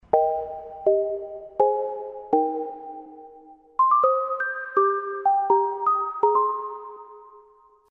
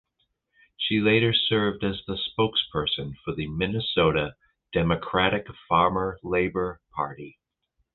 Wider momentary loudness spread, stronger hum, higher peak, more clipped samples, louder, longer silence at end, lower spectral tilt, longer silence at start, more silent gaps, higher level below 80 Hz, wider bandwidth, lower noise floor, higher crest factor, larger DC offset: first, 16 LU vs 11 LU; neither; about the same, -4 dBFS vs -6 dBFS; neither; about the same, -23 LUFS vs -25 LUFS; second, 0.5 s vs 0.65 s; about the same, -8 dB/octave vs -9 dB/octave; second, 0.15 s vs 0.8 s; neither; second, -66 dBFS vs -48 dBFS; second, 3.4 kHz vs 4.4 kHz; second, -55 dBFS vs -75 dBFS; about the same, 20 dB vs 22 dB; neither